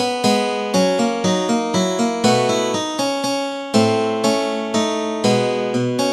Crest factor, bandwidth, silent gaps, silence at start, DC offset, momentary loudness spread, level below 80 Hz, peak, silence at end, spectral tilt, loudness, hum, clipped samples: 18 dB; 14 kHz; none; 0 s; under 0.1%; 4 LU; -66 dBFS; 0 dBFS; 0 s; -4.5 dB/octave; -18 LUFS; none; under 0.1%